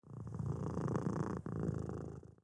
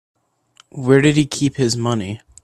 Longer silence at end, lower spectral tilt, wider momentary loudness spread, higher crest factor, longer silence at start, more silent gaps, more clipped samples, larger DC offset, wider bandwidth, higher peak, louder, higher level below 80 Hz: second, 0.1 s vs 0.25 s; first, -9 dB/octave vs -5.5 dB/octave; second, 9 LU vs 14 LU; about the same, 18 dB vs 18 dB; second, 0.05 s vs 0.75 s; neither; neither; neither; second, 10.5 kHz vs 13 kHz; second, -22 dBFS vs 0 dBFS; second, -41 LUFS vs -17 LUFS; second, -58 dBFS vs -50 dBFS